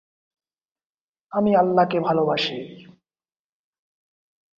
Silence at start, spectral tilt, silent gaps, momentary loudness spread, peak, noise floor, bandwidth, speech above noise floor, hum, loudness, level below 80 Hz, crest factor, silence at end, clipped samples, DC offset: 1.3 s; -7 dB/octave; none; 13 LU; -6 dBFS; under -90 dBFS; 7.4 kHz; over 70 dB; none; -21 LUFS; -66 dBFS; 20 dB; 1.75 s; under 0.1%; under 0.1%